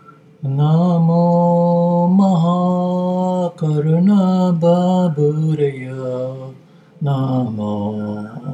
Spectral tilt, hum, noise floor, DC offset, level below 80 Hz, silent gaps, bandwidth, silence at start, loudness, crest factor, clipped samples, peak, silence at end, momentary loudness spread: -9.5 dB/octave; none; -42 dBFS; under 0.1%; -66 dBFS; none; 7.8 kHz; 0.4 s; -16 LUFS; 12 dB; under 0.1%; -2 dBFS; 0 s; 11 LU